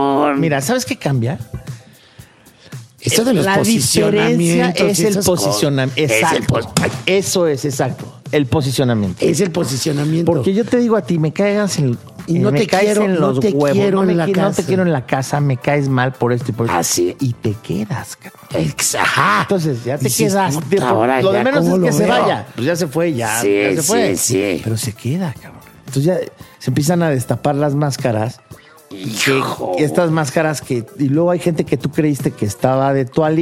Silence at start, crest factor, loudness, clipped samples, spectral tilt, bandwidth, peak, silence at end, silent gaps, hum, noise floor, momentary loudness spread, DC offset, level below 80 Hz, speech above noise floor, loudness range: 0 s; 16 dB; -16 LUFS; under 0.1%; -5 dB/octave; 16 kHz; 0 dBFS; 0 s; none; none; -45 dBFS; 8 LU; under 0.1%; -52 dBFS; 29 dB; 4 LU